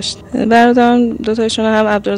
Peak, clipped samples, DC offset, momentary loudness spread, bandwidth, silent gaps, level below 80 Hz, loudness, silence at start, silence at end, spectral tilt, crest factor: -2 dBFS; under 0.1%; under 0.1%; 8 LU; 10.5 kHz; none; -42 dBFS; -12 LUFS; 0 s; 0 s; -4.5 dB/octave; 10 dB